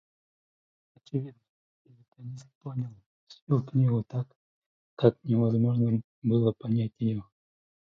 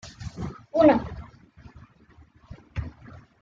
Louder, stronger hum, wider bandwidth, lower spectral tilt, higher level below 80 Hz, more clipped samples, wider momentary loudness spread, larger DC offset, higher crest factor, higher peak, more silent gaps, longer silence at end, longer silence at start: second, -28 LUFS vs -24 LUFS; neither; second, 6.6 kHz vs 7.6 kHz; first, -10.5 dB/octave vs -7.5 dB/octave; second, -64 dBFS vs -46 dBFS; neither; second, 18 LU vs 21 LU; neither; about the same, 24 dB vs 22 dB; about the same, -6 dBFS vs -6 dBFS; first, 1.49-1.85 s, 2.08-2.12 s, 2.55-2.61 s, 3.06-3.27 s, 3.42-3.47 s, 4.36-4.97 s, 6.04-6.22 s vs none; first, 0.7 s vs 0.5 s; first, 1.15 s vs 0.05 s